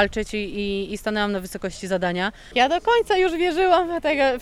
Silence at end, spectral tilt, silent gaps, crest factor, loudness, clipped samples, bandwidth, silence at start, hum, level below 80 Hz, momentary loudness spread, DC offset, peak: 0 s; -4.5 dB/octave; none; 18 dB; -22 LUFS; under 0.1%; 14 kHz; 0 s; none; -44 dBFS; 8 LU; under 0.1%; -4 dBFS